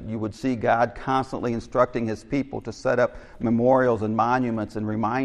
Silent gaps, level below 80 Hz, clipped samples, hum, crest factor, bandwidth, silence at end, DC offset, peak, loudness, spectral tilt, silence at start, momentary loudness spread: none; -48 dBFS; under 0.1%; none; 18 dB; 10.5 kHz; 0 s; under 0.1%; -6 dBFS; -24 LUFS; -7.5 dB/octave; 0 s; 9 LU